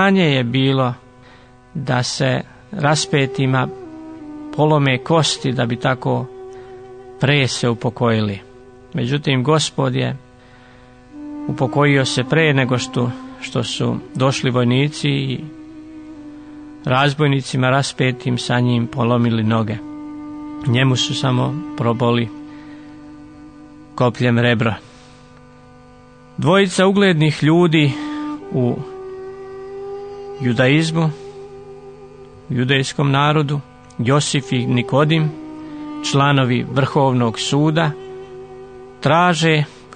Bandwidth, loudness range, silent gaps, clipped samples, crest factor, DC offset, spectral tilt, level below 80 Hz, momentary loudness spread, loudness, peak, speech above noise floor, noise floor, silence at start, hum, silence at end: 9.6 kHz; 4 LU; none; under 0.1%; 16 dB; 0.1%; -5.5 dB/octave; -52 dBFS; 21 LU; -17 LUFS; -2 dBFS; 29 dB; -45 dBFS; 0 s; none; 0 s